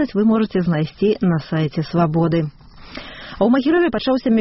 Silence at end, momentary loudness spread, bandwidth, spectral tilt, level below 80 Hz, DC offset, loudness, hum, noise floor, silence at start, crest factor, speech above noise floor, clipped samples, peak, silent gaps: 0 s; 17 LU; 6 kHz; -6.5 dB/octave; -46 dBFS; under 0.1%; -18 LUFS; none; -36 dBFS; 0 s; 12 dB; 19 dB; under 0.1%; -6 dBFS; none